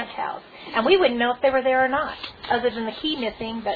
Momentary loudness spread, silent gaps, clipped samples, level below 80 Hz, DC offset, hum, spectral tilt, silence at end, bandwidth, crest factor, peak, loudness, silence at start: 12 LU; none; under 0.1%; -54 dBFS; under 0.1%; none; -6.5 dB/octave; 0 s; 4.9 kHz; 18 dB; -4 dBFS; -22 LUFS; 0 s